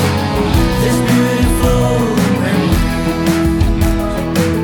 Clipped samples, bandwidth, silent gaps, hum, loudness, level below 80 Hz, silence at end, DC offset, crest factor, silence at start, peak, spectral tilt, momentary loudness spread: under 0.1%; 19.5 kHz; none; none; -14 LUFS; -20 dBFS; 0 s; under 0.1%; 12 dB; 0 s; -2 dBFS; -6 dB/octave; 3 LU